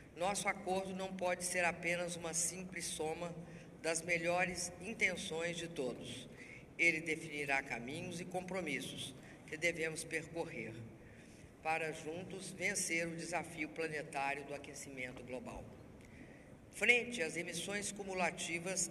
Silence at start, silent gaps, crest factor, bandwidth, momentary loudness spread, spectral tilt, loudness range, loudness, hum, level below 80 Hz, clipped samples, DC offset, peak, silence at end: 0 s; none; 26 dB; 13.5 kHz; 17 LU; -3 dB/octave; 4 LU; -39 LUFS; none; -68 dBFS; under 0.1%; under 0.1%; -16 dBFS; 0 s